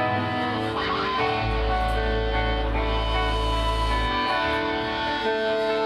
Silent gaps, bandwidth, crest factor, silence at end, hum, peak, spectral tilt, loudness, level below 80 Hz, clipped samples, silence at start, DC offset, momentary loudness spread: none; 11.5 kHz; 12 dB; 0 s; none; -12 dBFS; -5.5 dB/octave; -25 LUFS; -30 dBFS; under 0.1%; 0 s; under 0.1%; 2 LU